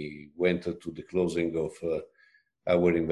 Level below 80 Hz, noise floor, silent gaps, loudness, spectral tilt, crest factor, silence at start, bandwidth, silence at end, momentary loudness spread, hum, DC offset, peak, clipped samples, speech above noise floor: -54 dBFS; -64 dBFS; none; -29 LUFS; -7 dB/octave; 18 dB; 0 s; 11.5 kHz; 0 s; 13 LU; none; under 0.1%; -12 dBFS; under 0.1%; 36 dB